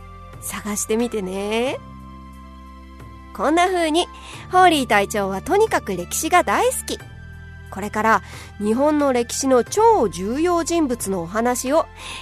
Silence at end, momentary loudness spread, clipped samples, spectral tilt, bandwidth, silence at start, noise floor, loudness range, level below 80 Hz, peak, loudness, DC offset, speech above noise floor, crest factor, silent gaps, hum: 0 s; 23 LU; under 0.1%; -3.5 dB/octave; 13.5 kHz; 0 s; -40 dBFS; 5 LU; -44 dBFS; 0 dBFS; -20 LUFS; under 0.1%; 20 dB; 20 dB; none; none